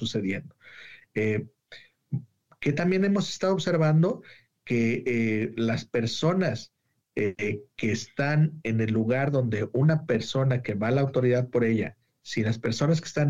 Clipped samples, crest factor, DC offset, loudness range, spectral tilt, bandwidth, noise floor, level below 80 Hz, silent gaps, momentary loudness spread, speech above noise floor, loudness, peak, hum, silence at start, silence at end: under 0.1%; 14 dB; 0.2%; 3 LU; -6.5 dB/octave; 7.8 kHz; -52 dBFS; -62 dBFS; none; 12 LU; 26 dB; -26 LUFS; -12 dBFS; none; 0 s; 0 s